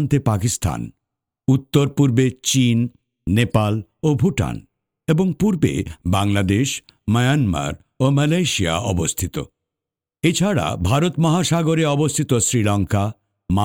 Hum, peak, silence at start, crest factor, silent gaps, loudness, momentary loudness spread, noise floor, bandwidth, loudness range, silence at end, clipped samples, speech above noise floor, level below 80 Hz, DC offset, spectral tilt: none; -2 dBFS; 0 s; 16 dB; none; -19 LUFS; 10 LU; -87 dBFS; 17 kHz; 2 LU; 0 s; under 0.1%; 68 dB; -42 dBFS; under 0.1%; -5.5 dB/octave